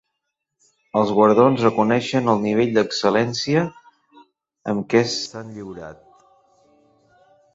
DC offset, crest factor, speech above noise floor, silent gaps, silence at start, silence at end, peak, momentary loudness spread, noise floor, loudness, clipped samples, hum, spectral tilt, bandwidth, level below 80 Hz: under 0.1%; 18 dB; 60 dB; none; 0.95 s; 1.6 s; -2 dBFS; 19 LU; -79 dBFS; -19 LUFS; under 0.1%; none; -5.5 dB/octave; 7.8 kHz; -60 dBFS